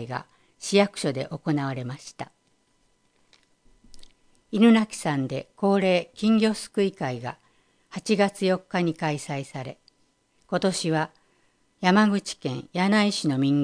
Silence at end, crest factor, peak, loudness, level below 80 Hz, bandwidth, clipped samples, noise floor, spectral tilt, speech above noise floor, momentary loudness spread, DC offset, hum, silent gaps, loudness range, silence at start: 0 s; 20 dB; -6 dBFS; -24 LUFS; -64 dBFS; 10.5 kHz; under 0.1%; -67 dBFS; -5.5 dB/octave; 43 dB; 16 LU; under 0.1%; none; none; 6 LU; 0 s